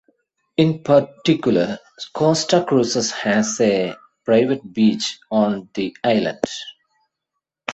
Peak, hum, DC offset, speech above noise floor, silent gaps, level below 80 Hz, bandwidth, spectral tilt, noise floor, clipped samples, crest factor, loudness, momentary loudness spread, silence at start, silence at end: -2 dBFS; none; under 0.1%; 62 dB; none; -60 dBFS; 8.2 kHz; -5 dB/octave; -81 dBFS; under 0.1%; 18 dB; -19 LUFS; 10 LU; 0.6 s; 0 s